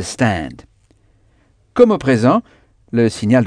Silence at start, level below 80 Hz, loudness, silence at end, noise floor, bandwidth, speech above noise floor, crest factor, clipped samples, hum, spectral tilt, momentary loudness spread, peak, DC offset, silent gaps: 0 s; -46 dBFS; -15 LUFS; 0 s; -55 dBFS; 10 kHz; 41 dB; 16 dB; 0.1%; none; -6.5 dB/octave; 11 LU; 0 dBFS; under 0.1%; none